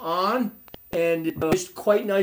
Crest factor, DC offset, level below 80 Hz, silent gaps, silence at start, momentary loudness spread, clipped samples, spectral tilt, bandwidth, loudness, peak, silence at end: 18 dB; under 0.1%; -56 dBFS; none; 0 s; 6 LU; under 0.1%; -5 dB/octave; over 20 kHz; -24 LUFS; -6 dBFS; 0 s